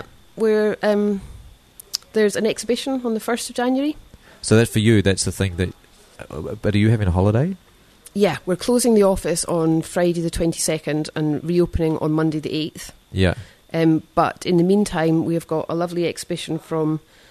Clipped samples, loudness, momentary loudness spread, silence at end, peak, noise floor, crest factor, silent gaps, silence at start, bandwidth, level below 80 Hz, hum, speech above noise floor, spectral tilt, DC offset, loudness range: under 0.1%; -20 LUFS; 12 LU; 0.3 s; 0 dBFS; -48 dBFS; 20 dB; none; 0 s; 13.5 kHz; -42 dBFS; none; 29 dB; -5.5 dB/octave; under 0.1%; 3 LU